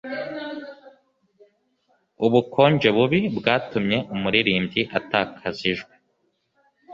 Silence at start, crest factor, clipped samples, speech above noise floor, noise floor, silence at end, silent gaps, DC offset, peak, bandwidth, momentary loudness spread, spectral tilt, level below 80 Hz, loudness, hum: 0.05 s; 22 dB; under 0.1%; 49 dB; -70 dBFS; 0 s; none; under 0.1%; -2 dBFS; 7.4 kHz; 14 LU; -7 dB/octave; -58 dBFS; -22 LUFS; none